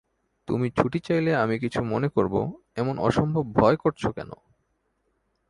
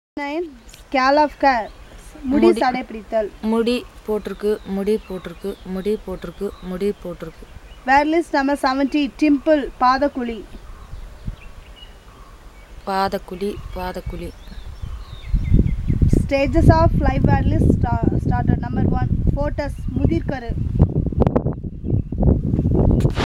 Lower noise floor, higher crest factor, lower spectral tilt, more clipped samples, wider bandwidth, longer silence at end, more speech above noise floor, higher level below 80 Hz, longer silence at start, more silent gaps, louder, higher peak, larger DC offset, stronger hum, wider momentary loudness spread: first, -73 dBFS vs -42 dBFS; about the same, 24 dB vs 20 dB; about the same, -8 dB/octave vs -8 dB/octave; neither; second, 11.5 kHz vs 14 kHz; first, 1.15 s vs 0.15 s; first, 48 dB vs 23 dB; second, -52 dBFS vs -28 dBFS; first, 0.5 s vs 0.15 s; neither; second, -25 LUFS vs -20 LUFS; about the same, -2 dBFS vs 0 dBFS; neither; neither; second, 9 LU vs 18 LU